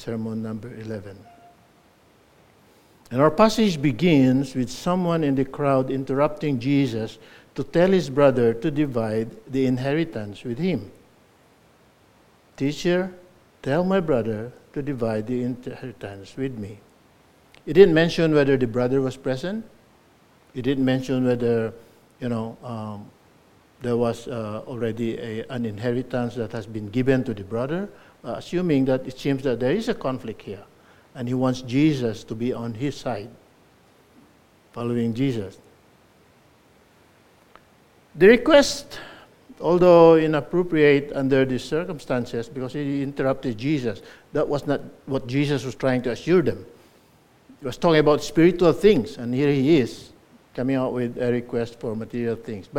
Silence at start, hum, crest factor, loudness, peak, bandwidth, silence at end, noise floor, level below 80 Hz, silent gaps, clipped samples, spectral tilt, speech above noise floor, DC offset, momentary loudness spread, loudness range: 0 s; none; 22 dB; -22 LUFS; -2 dBFS; 16 kHz; 0 s; -57 dBFS; -50 dBFS; none; under 0.1%; -6.5 dB/octave; 35 dB; under 0.1%; 16 LU; 10 LU